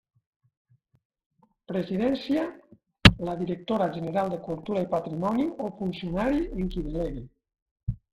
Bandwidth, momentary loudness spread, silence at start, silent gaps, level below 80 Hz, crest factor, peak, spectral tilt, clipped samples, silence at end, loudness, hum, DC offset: 14.5 kHz; 15 LU; 1.7 s; 7.62-7.76 s, 7.83-7.87 s; -42 dBFS; 28 dB; 0 dBFS; -6 dB/octave; under 0.1%; 0.2 s; -27 LUFS; none; under 0.1%